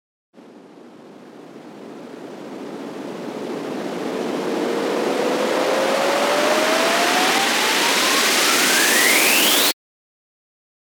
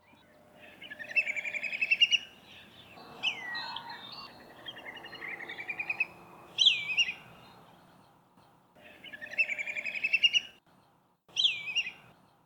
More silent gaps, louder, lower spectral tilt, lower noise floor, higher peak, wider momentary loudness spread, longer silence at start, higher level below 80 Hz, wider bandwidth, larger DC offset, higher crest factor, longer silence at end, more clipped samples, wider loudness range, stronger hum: neither; first, -17 LUFS vs -29 LUFS; first, -1 dB/octave vs 0.5 dB/octave; second, -43 dBFS vs -67 dBFS; first, -2 dBFS vs -10 dBFS; second, 20 LU vs 23 LU; about the same, 0.5 s vs 0.55 s; about the same, -76 dBFS vs -76 dBFS; about the same, over 20 kHz vs 20 kHz; neither; second, 18 dB vs 24 dB; first, 1.1 s vs 0.45 s; neither; first, 18 LU vs 8 LU; neither